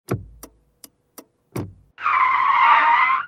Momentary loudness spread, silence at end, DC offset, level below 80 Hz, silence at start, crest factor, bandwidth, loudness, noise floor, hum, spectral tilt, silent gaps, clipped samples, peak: 19 LU; 0 s; under 0.1%; -54 dBFS; 0.1 s; 18 dB; 16 kHz; -16 LUFS; -51 dBFS; none; -4 dB/octave; none; under 0.1%; -2 dBFS